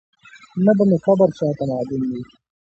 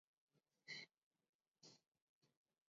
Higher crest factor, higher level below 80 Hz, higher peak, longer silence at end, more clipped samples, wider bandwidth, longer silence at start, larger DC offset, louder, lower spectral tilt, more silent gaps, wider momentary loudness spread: second, 16 dB vs 26 dB; first, -58 dBFS vs under -90 dBFS; first, -2 dBFS vs -42 dBFS; about the same, 0.5 s vs 0.4 s; neither; about the same, 7.6 kHz vs 7.4 kHz; about the same, 0.35 s vs 0.35 s; neither; first, -19 LUFS vs -59 LUFS; first, -9.5 dB/octave vs 0 dB/octave; second, none vs 0.98-1.11 s, 1.29-1.39 s, 1.48-1.52 s, 1.88-1.92 s, 2.02-2.22 s; about the same, 12 LU vs 13 LU